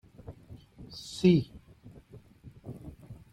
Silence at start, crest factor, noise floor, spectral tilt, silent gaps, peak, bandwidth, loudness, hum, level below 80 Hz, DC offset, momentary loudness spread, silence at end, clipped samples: 0.3 s; 22 dB; -54 dBFS; -7 dB/octave; none; -12 dBFS; 11.5 kHz; -27 LUFS; none; -58 dBFS; under 0.1%; 27 LU; 0.2 s; under 0.1%